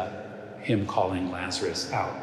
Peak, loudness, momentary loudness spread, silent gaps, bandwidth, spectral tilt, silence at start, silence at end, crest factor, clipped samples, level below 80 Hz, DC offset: -10 dBFS; -29 LUFS; 11 LU; none; 13.5 kHz; -5 dB/octave; 0 s; 0 s; 18 dB; under 0.1%; -68 dBFS; under 0.1%